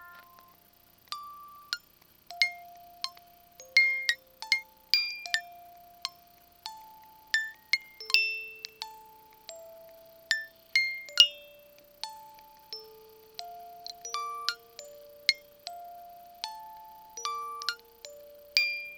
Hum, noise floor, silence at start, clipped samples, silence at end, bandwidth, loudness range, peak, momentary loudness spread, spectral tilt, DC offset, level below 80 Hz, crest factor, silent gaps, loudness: none; -61 dBFS; 0 s; under 0.1%; 0 s; over 20 kHz; 8 LU; 0 dBFS; 24 LU; 2.5 dB/octave; under 0.1%; -76 dBFS; 34 dB; none; -29 LUFS